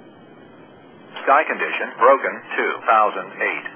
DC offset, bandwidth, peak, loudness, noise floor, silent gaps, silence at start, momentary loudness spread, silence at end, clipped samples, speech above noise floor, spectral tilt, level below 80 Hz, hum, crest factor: under 0.1%; 3.5 kHz; -2 dBFS; -19 LUFS; -45 dBFS; none; 1.1 s; 8 LU; 0 s; under 0.1%; 26 dB; -6.5 dB/octave; -76 dBFS; none; 20 dB